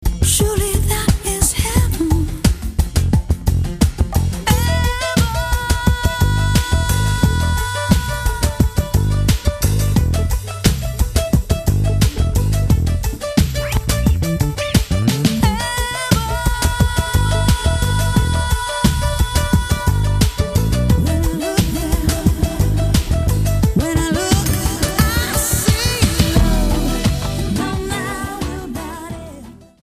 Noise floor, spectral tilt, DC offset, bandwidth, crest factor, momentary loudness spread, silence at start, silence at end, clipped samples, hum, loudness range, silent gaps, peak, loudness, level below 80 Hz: -37 dBFS; -5 dB/octave; under 0.1%; 15.5 kHz; 16 dB; 4 LU; 0 s; 0.25 s; under 0.1%; none; 1 LU; none; 0 dBFS; -17 LUFS; -20 dBFS